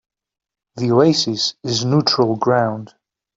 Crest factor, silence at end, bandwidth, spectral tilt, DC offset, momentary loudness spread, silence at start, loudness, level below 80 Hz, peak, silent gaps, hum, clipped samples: 16 dB; 0.5 s; 7.8 kHz; -5 dB/octave; under 0.1%; 9 LU; 0.75 s; -17 LUFS; -60 dBFS; -2 dBFS; none; none; under 0.1%